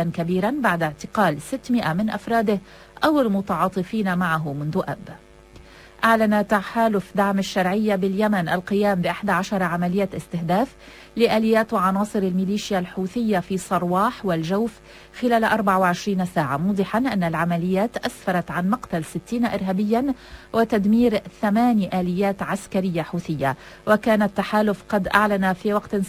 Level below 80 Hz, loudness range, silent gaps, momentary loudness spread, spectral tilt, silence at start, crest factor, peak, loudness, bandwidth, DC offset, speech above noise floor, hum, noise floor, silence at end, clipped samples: -50 dBFS; 2 LU; none; 7 LU; -6.5 dB/octave; 0 s; 20 dB; -2 dBFS; -22 LUFS; 16 kHz; under 0.1%; 25 dB; none; -46 dBFS; 0 s; under 0.1%